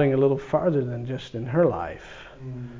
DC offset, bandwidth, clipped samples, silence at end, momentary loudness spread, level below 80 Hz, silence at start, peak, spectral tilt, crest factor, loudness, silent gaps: under 0.1%; 7.6 kHz; under 0.1%; 0 s; 17 LU; -52 dBFS; 0 s; -10 dBFS; -8.5 dB/octave; 16 dB; -25 LUFS; none